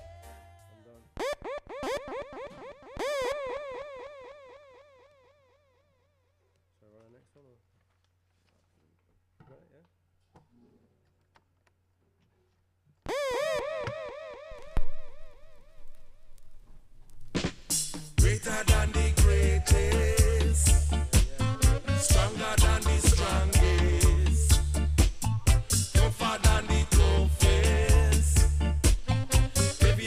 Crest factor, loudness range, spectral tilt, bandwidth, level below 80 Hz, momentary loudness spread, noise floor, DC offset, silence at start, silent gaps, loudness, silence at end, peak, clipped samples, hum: 18 dB; 15 LU; -4.5 dB/octave; 16 kHz; -30 dBFS; 16 LU; -72 dBFS; under 0.1%; 0 s; none; -26 LUFS; 0 s; -8 dBFS; under 0.1%; none